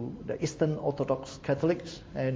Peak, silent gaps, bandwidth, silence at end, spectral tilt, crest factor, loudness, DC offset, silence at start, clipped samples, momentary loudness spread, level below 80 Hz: -12 dBFS; none; 8 kHz; 0 s; -6.5 dB/octave; 18 dB; -31 LUFS; under 0.1%; 0 s; under 0.1%; 6 LU; -56 dBFS